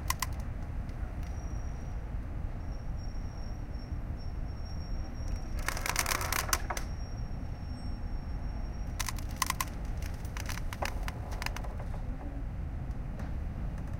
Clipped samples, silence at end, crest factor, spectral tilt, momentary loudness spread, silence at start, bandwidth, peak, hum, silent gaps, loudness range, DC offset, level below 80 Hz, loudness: under 0.1%; 0 s; 26 dB; -3.5 dB/octave; 9 LU; 0 s; 17 kHz; -10 dBFS; none; none; 6 LU; under 0.1%; -38 dBFS; -38 LUFS